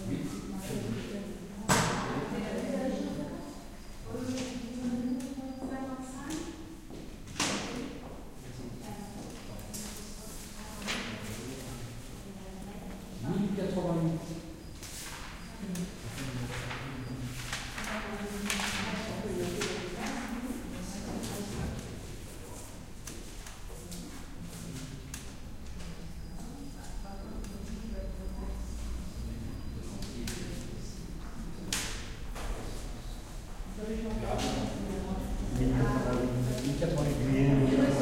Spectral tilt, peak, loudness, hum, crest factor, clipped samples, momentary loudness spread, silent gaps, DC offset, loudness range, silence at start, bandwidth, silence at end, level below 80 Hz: -5 dB/octave; -12 dBFS; -36 LUFS; none; 24 dB; under 0.1%; 14 LU; none; under 0.1%; 10 LU; 0 s; 16 kHz; 0 s; -44 dBFS